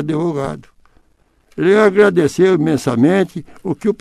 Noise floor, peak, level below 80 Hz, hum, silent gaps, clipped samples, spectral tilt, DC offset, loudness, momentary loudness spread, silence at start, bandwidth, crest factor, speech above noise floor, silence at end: -56 dBFS; 0 dBFS; -50 dBFS; none; none; under 0.1%; -7 dB/octave; under 0.1%; -15 LUFS; 14 LU; 0 s; 13 kHz; 16 dB; 42 dB; 0.05 s